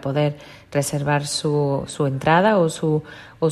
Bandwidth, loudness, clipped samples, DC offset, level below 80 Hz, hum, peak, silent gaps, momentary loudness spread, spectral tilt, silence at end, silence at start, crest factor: 13.5 kHz; -21 LUFS; under 0.1%; under 0.1%; -54 dBFS; none; -4 dBFS; none; 9 LU; -5.5 dB/octave; 0 s; 0 s; 16 dB